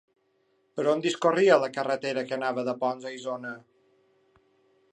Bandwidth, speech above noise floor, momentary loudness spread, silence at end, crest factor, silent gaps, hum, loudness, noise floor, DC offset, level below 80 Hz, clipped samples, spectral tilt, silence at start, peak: 10.5 kHz; 44 dB; 15 LU; 1.35 s; 22 dB; none; none; -27 LUFS; -70 dBFS; under 0.1%; -82 dBFS; under 0.1%; -4.5 dB/octave; 0.75 s; -8 dBFS